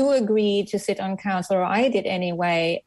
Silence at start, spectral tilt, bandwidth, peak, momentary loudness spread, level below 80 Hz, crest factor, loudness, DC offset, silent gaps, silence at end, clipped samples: 0 s; -5.5 dB/octave; 12.5 kHz; -10 dBFS; 6 LU; -64 dBFS; 12 dB; -23 LUFS; under 0.1%; none; 0.05 s; under 0.1%